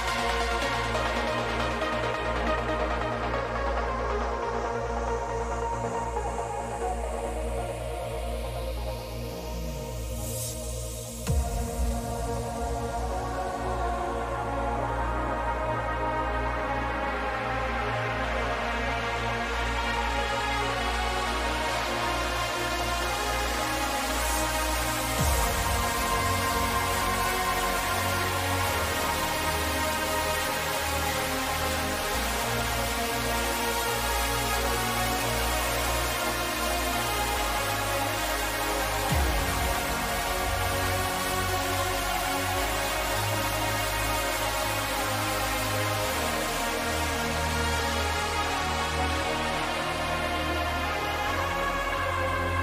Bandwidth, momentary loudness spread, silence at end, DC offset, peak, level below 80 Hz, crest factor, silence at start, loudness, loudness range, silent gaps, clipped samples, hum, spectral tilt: 16 kHz; 5 LU; 0 s; under 0.1%; -12 dBFS; -36 dBFS; 16 dB; 0 s; -28 LUFS; 5 LU; none; under 0.1%; none; -3.5 dB/octave